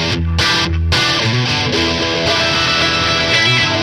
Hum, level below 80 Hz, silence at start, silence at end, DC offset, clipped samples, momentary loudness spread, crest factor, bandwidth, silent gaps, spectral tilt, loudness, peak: none; -28 dBFS; 0 s; 0 s; under 0.1%; under 0.1%; 3 LU; 12 dB; 15.5 kHz; none; -3.5 dB/octave; -13 LUFS; -2 dBFS